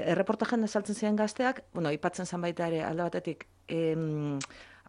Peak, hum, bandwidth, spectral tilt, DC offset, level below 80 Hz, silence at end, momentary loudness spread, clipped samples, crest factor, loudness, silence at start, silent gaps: -14 dBFS; none; 11.5 kHz; -6 dB/octave; under 0.1%; -68 dBFS; 0.15 s; 8 LU; under 0.1%; 18 dB; -32 LUFS; 0 s; none